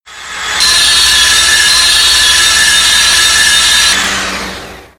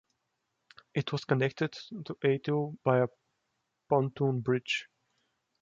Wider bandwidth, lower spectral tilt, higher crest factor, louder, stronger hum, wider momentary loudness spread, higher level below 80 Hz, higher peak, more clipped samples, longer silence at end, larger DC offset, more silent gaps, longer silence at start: first, over 20 kHz vs 7.6 kHz; second, 1.5 dB/octave vs -7 dB/octave; second, 8 dB vs 22 dB; first, -5 LUFS vs -31 LUFS; neither; first, 13 LU vs 7 LU; first, -32 dBFS vs -72 dBFS; first, 0 dBFS vs -10 dBFS; first, 0.3% vs under 0.1%; second, 0.15 s vs 0.8 s; neither; neither; second, 0.05 s vs 0.95 s